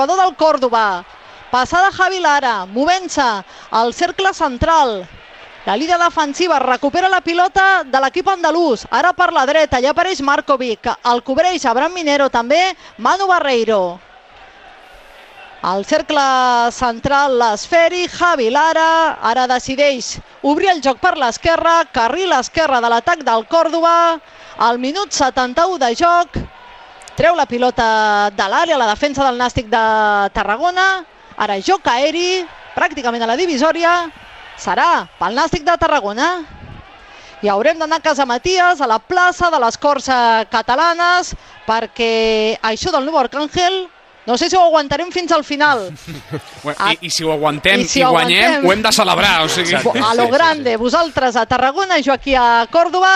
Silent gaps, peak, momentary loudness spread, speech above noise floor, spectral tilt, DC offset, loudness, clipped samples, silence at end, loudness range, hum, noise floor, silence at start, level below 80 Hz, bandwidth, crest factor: none; 0 dBFS; 7 LU; 27 dB; -3 dB/octave; under 0.1%; -14 LUFS; under 0.1%; 0 s; 3 LU; none; -41 dBFS; 0 s; -42 dBFS; 15 kHz; 14 dB